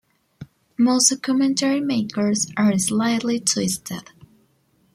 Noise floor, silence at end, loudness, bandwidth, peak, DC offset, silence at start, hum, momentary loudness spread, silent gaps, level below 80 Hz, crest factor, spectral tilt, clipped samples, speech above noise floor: -62 dBFS; 0.95 s; -20 LUFS; 16 kHz; -4 dBFS; under 0.1%; 0.4 s; none; 10 LU; none; -62 dBFS; 18 dB; -3.5 dB/octave; under 0.1%; 42 dB